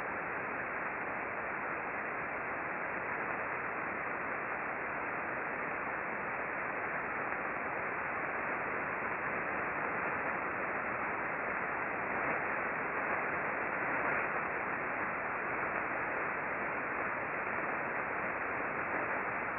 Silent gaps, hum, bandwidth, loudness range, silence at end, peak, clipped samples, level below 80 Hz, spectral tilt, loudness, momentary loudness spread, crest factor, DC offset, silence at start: none; none; 4.4 kHz; 3 LU; 0 s; -18 dBFS; under 0.1%; -66 dBFS; -5 dB/octave; -36 LUFS; 3 LU; 18 dB; under 0.1%; 0 s